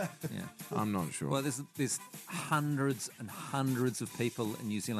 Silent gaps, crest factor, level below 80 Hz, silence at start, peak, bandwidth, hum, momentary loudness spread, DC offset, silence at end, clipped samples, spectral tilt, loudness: none; 20 dB; -76 dBFS; 0 s; -16 dBFS; 14 kHz; none; 9 LU; under 0.1%; 0 s; under 0.1%; -5 dB/octave; -36 LUFS